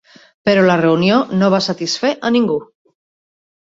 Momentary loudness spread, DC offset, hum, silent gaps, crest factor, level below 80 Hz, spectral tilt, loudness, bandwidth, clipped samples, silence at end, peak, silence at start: 7 LU; under 0.1%; none; none; 14 dB; -56 dBFS; -5.5 dB/octave; -15 LUFS; 7.8 kHz; under 0.1%; 1.05 s; -2 dBFS; 0.45 s